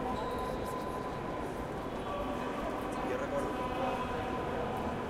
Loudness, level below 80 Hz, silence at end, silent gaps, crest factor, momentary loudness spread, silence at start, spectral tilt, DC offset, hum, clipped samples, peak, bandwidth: -36 LUFS; -50 dBFS; 0 s; none; 16 dB; 4 LU; 0 s; -6 dB/octave; under 0.1%; none; under 0.1%; -20 dBFS; 16.5 kHz